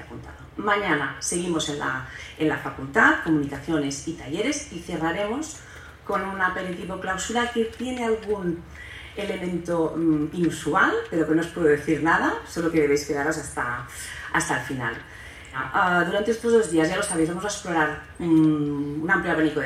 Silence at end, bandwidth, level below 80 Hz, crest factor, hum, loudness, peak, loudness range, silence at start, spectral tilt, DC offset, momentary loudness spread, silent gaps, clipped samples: 0 s; 14.5 kHz; -50 dBFS; 20 dB; none; -24 LUFS; -4 dBFS; 5 LU; 0 s; -4.5 dB/octave; under 0.1%; 12 LU; none; under 0.1%